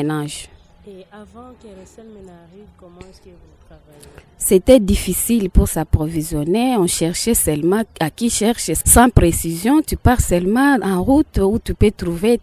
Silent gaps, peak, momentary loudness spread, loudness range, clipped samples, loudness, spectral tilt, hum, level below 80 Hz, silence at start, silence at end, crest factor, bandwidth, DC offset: none; 0 dBFS; 9 LU; 5 LU; under 0.1%; -16 LUFS; -5 dB/octave; none; -28 dBFS; 0 s; 0 s; 18 dB; 16 kHz; under 0.1%